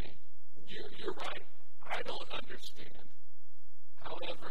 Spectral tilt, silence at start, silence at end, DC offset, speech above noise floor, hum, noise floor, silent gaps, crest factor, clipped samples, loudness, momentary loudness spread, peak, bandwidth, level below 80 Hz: -4.5 dB/octave; 0 s; 0 s; 6%; 24 dB; none; -69 dBFS; none; 22 dB; under 0.1%; -44 LUFS; 16 LU; -20 dBFS; 16.5 kHz; -66 dBFS